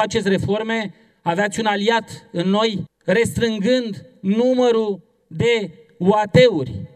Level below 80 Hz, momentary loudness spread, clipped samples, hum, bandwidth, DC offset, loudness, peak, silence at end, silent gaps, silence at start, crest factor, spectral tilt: -52 dBFS; 12 LU; under 0.1%; none; 13.5 kHz; under 0.1%; -19 LUFS; -2 dBFS; 0.1 s; none; 0 s; 18 dB; -5.5 dB/octave